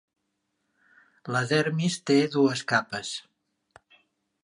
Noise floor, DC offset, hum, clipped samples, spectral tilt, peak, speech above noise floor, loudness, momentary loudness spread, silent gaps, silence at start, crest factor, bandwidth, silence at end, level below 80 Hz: -78 dBFS; under 0.1%; none; under 0.1%; -5 dB/octave; -8 dBFS; 53 dB; -25 LUFS; 12 LU; none; 1.25 s; 20 dB; 11 kHz; 1.25 s; -72 dBFS